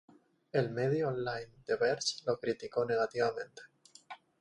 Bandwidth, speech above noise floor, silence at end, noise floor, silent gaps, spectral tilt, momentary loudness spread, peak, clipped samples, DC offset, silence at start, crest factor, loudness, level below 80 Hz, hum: 10.5 kHz; 20 dB; 0.25 s; -54 dBFS; none; -4.5 dB/octave; 18 LU; -18 dBFS; under 0.1%; under 0.1%; 0.55 s; 18 dB; -34 LUFS; -72 dBFS; none